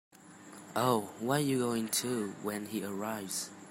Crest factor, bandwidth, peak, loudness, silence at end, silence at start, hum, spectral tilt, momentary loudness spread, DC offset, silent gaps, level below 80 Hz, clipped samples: 20 dB; 16 kHz; -14 dBFS; -34 LUFS; 0 s; 0.2 s; none; -4 dB/octave; 9 LU; under 0.1%; none; -76 dBFS; under 0.1%